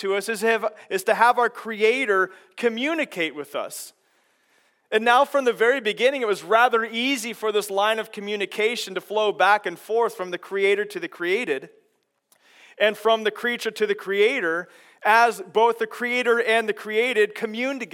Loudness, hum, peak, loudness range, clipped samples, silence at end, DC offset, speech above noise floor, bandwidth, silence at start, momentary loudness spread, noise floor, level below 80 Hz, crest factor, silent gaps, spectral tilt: -22 LUFS; none; -2 dBFS; 4 LU; under 0.1%; 0.1 s; under 0.1%; 47 dB; 17 kHz; 0 s; 10 LU; -70 dBFS; under -90 dBFS; 20 dB; none; -3 dB/octave